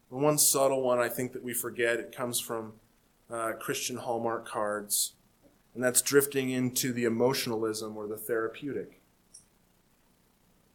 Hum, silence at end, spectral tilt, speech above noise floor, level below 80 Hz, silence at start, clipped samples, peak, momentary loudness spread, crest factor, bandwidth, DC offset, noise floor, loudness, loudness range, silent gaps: none; 1.35 s; -3 dB/octave; 37 dB; -70 dBFS; 0.1 s; under 0.1%; -8 dBFS; 14 LU; 22 dB; 19 kHz; under 0.1%; -67 dBFS; -29 LUFS; 5 LU; none